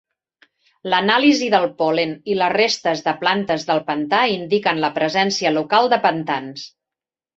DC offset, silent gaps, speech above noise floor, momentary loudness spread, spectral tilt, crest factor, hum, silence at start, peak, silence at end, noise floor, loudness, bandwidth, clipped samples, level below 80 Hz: under 0.1%; none; 70 dB; 9 LU; -4 dB/octave; 18 dB; none; 0.85 s; -2 dBFS; 0.7 s; -89 dBFS; -18 LUFS; 8 kHz; under 0.1%; -64 dBFS